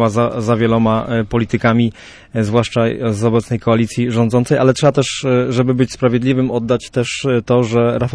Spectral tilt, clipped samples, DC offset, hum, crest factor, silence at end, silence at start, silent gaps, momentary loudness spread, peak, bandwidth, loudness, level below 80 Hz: -6.5 dB/octave; under 0.1%; under 0.1%; none; 14 dB; 0 s; 0 s; none; 4 LU; -2 dBFS; 11 kHz; -15 LUFS; -42 dBFS